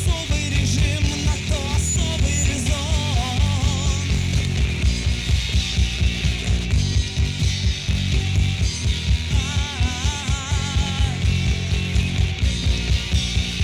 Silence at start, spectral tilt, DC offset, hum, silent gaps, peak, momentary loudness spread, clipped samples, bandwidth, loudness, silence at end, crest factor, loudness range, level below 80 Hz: 0 s; -4 dB/octave; under 0.1%; none; none; -6 dBFS; 2 LU; under 0.1%; 13 kHz; -21 LUFS; 0 s; 14 dB; 1 LU; -24 dBFS